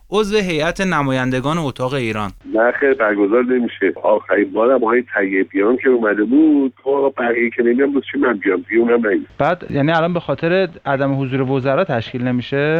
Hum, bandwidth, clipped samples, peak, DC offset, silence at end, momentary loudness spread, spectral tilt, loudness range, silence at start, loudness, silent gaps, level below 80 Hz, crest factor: none; 11.5 kHz; under 0.1%; -2 dBFS; under 0.1%; 0 s; 5 LU; -7 dB/octave; 2 LU; 0.1 s; -17 LUFS; none; -48 dBFS; 14 dB